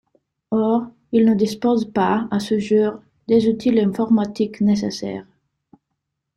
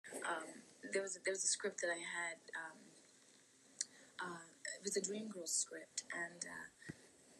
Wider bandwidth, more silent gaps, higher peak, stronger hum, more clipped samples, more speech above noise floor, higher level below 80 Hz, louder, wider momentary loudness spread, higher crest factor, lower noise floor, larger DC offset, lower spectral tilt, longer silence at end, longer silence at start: about the same, 12 kHz vs 13 kHz; neither; first, -4 dBFS vs -22 dBFS; neither; neither; first, 59 dB vs 24 dB; first, -58 dBFS vs -90 dBFS; first, -19 LUFS vs -43 LUFS; second, 8 LU vs 16 LU; second, 14 dB vs 24 dB; first, -78 dBFS vs -68 dBFS; neither; first, -7 dB/octave vs -1 dB/octave; first, 1.15 s vs 0 s; first, 0.5 s vs 0.05 s